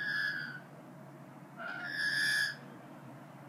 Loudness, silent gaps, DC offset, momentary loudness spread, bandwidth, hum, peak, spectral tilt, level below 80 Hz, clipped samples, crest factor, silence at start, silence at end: -34 LUFS; none; under 0.1%; 22 LU; 15.5 kHz; none; -22 dBFS; -2 dB/octave; -90 dBFS; under 0.1%; 16 dB; 0 s; 0 s